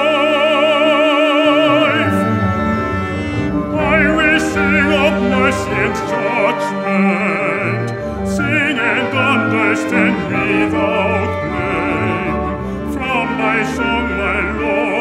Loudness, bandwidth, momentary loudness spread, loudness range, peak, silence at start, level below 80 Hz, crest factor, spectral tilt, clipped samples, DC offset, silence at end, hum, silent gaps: -15 LUFS; 15 kHz; 7 LU; 3 LU; 0 dBFS; 0 s; -34 dBFS; 14 dB; -5.5 dB/octave; under 0.1%; under 0.1%; 0 s; none; none